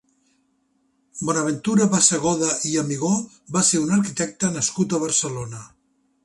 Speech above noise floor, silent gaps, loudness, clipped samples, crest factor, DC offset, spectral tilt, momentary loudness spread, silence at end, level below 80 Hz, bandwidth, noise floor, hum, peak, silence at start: 45 dB; none; -21 LUFS; under 0.1%; 22 dB; under 0.1%; -4 dB/octave; 12 LU; 0.6 s; -58 dBFS; 11.5 kHz; -67 dBFS; none; 0 dBFS; 1.15 s